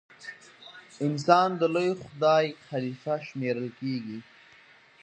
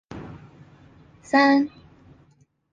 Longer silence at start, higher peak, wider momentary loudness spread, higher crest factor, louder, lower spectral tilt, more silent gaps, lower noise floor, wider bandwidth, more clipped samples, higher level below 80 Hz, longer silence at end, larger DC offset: about the same, 0.2 s vs 0.1 s; about the same, -4 dBFS vs -6 dBFS; about the same, 22 LU vs 23 LU; first, 26 dB vs 20 dB; second, -27 LUFS vs -20 LUFS; about the same, -6 dB/octave vs -5.5 dB/octave; neither; second, -56 dBFS vs -60 dBFS; first, 9.4 kHz vs 7.6 kHz; neither; second, -74 dBFS vs -58 dBFS; second, 0.8 s vs 1.05 s; neither